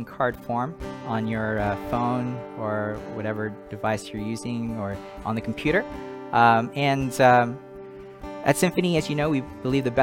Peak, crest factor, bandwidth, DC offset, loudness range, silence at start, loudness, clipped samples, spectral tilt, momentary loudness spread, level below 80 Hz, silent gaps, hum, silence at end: -4 dBFS; 22 dB; 17 kHz; under 0.1%; 7 LU; 0 s; -25 LUFS; under 0.1%; -6 dB/octave; 14 LU; -48 dBFS; none; none; 0 s